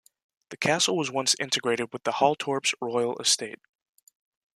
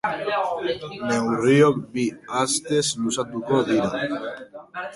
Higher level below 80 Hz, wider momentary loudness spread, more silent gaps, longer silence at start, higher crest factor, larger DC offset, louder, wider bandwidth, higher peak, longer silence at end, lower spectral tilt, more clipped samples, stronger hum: second, -74 dBFS vs -60 dBFS; second, 5 LU vs 12 LU; neither; first, 0.5 s vs 0.05 s; about the same, 22 dB vs 18 dB; neither; about the same, -25 LUFS vs -23 LUFS; first, 14 kHz vs 11.5 kHz; about the same, -6 dBFS vs -4 dBFS; first, 1 s vs 0 s; second, -2 dB/octave vs -4.5 dB/octave; neither; neither